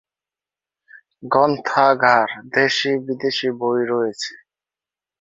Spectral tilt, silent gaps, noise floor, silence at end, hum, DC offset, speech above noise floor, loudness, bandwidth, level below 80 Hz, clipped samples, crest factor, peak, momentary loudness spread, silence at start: -4 dB/octave; none; -90 dBFS; 0.85 s; none; under 0.1%; 71 dB; -18 LUFS; 8 kHz; -66 dBFS; under 0.1%; 20 dB; -2 dBFS; 9 LU; 1.2 s